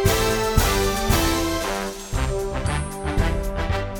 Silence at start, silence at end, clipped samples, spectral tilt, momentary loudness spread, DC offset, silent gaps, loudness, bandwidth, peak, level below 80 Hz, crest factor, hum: 0 s; 0 s; under 0.1%; -4.5 dB/octave; 7 LU; under 0.1%; none; -23 LUFS; 17.5 kHz; -4 dBFS; -28 dBFS; 18 dB; none